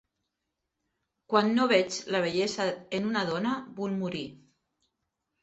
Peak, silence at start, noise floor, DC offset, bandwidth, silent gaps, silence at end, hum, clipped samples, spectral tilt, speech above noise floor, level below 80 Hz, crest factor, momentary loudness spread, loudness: -8 dBFS; 1.3 s; -84 dBFS; under 0.1%; 8.2 kHz; none; 1.05 s; none; under 0.1%; -4.5 dB/octave; 56 dB; -70 dBFS; 22 dB; 10 LU; -28 LUFS